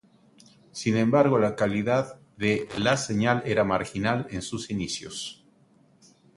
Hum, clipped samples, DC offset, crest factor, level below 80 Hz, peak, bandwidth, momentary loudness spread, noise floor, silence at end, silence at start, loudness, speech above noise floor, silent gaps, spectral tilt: none; under 0.1%; under 0.1%; 20 dB; -56 dBFS; -6 dBFS; 11.5 kHz; 12 LU; -60 dBFS; 1.05 s; 0.75 s; -26 LUFS; 35 dB; none; -5.5 dB/octave